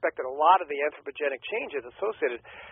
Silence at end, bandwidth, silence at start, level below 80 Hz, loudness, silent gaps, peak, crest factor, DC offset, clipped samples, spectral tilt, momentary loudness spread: 0 s; 3.8 kHz; 0 s; -70 dBFS; -27 LUFS; none; -6 dBFS; 22 dB; under 0.1%; under 0.1%; 4 dB/octave; 11 LU